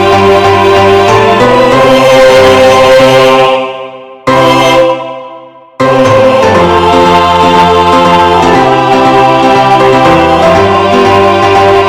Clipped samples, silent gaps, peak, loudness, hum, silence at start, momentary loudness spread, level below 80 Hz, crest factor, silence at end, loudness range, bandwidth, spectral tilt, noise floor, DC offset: 20%; none; 0 dBFS; -5 LUFS; none; 0 s; 6 LU; -32 dBFS; 4 dB; 0 s; 4 LU; 16 kHz; -5 dB/octave; -29 dBFS; under 0.1%